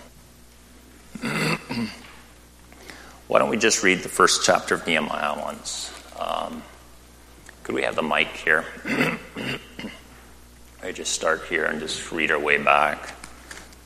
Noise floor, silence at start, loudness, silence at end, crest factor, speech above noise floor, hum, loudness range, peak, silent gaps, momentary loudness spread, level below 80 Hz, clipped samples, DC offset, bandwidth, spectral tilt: -49 dBFS; 0 s; -23 LUFS; 0.05 s; 24 dB; 26 dB; none; 7 LU; 0 dBFS; none; 22 LU; -52 dBFS; under 0.1%; under 0.1%; 15.5 kHz; -2.5 dB/octave